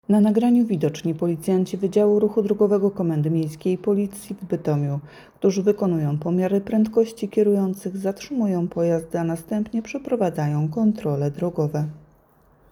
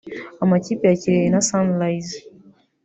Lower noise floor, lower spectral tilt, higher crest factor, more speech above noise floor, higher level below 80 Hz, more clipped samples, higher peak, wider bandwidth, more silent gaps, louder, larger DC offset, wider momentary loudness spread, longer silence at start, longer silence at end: first, -57 dBFS vs -51 dBFS; first, -8 dB/octave vs -5.5 dB/octave; about the same, 16 dB vs 16 dB; about the same, 35 dB vs 32 dB; about the same, -58 dBFS vs -58 dBFS; neither; about the same, -6 dBFS vs -4 dBFS; first, 15.5 kHz vs 8.2 kHz; neither; second, -22 LUFS vs -19 LUFS; neither; second, 8 LU vs 15 LU; about the same, 0.1 s vs 0.05 s; about the same, 0.75 s vs 0.65 s